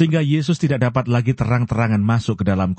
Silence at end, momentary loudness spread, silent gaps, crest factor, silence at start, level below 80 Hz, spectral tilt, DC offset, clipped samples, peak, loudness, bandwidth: 0.05 s; 2 LU; none; 14 dB; 0 s; -44 dBFS; -7.5 dB/octave; under 0.1%; under 0.1%; -4 dBFS; -19 LUFS; 8.6 kHz